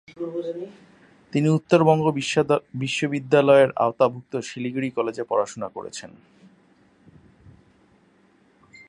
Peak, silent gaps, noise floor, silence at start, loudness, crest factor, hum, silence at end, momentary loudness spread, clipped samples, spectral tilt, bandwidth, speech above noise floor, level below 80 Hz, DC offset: -4 dBFS; none; -59 dBFS; 0.2 s; -22 LUFS; 20 dB; none; 2.8 s; 16 LU; under 0.1%; -6 dB/octave; 11 kHz; 37 dB; -64 dBFS; under 0.1%